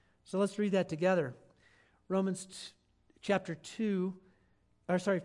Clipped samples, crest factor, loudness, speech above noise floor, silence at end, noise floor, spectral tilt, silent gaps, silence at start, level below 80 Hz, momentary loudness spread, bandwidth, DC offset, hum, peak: under 0.1%; 18 dB; -34 LUFS; 38 dB; 0 s; -71 dBFS; -6 dB/octave; none; 0.3 s; -76 dBFS; 15 LU; 11.5 kHz; under 0.1%; none; -18 dBFS